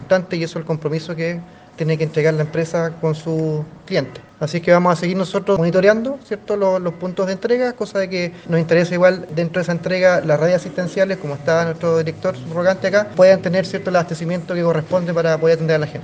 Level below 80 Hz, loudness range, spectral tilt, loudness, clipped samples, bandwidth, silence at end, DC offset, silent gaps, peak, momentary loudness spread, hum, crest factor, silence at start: -56 dBFS; 4 LU; -6.5 dB/octave; -18 LUFS; under 0.1%; 9.2 kHz; 0 s; under 0.1%; none; 0 dBFS; 9 LU; none; 18 dB; 0 s